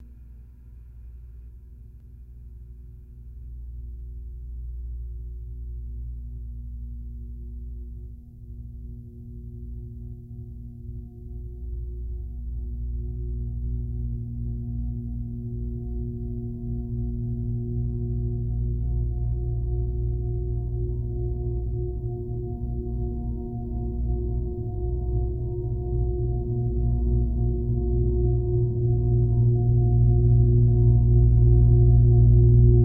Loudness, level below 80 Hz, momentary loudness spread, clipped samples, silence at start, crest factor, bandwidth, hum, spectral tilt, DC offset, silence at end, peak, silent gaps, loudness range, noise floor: -25 LUFS; -28 dBFS; 22 LU; under 0.1%; 0 s; 18 dB; 1 kHz; 60 Hz at -40 dBFS; -15 dB/octave; under 0.1%; 0 s; -6 dBFS; none; 20 LU; -45 dBFS